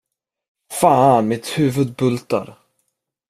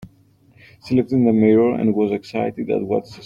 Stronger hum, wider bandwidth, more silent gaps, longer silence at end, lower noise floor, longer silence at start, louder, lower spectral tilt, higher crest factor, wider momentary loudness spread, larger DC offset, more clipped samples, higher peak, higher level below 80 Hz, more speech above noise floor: neither; first, 15.5 kHz vs 7.2 kHz; neither; first, 0.75 s vs 0 s; first, -72 dBFS vs -54 dBFS; first, 0.7 s vs 0 s; about the same, -17 LUFS vs -19 LUFS; second, -6 dB/octave vs -9 dB/octave; about the same, 18 dB vs 16 dB; about the same, 11 LU vs 9 LU; neither; neither; first, 0 dBFS vs -4 dBFS; about the same, -58 dBFS vs -56 dBFS; first, 56 dB vs 36 dB